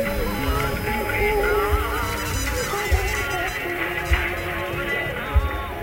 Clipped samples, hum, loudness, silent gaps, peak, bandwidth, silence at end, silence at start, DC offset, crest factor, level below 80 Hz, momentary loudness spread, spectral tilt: under 0.1%; none; -23 LUFS; none; -6 dBFS; 16 kHz; 0 s; 0 s; under 0.1%; 18 dB; -28 dBFS; 4 LU; -4.5 dB/octave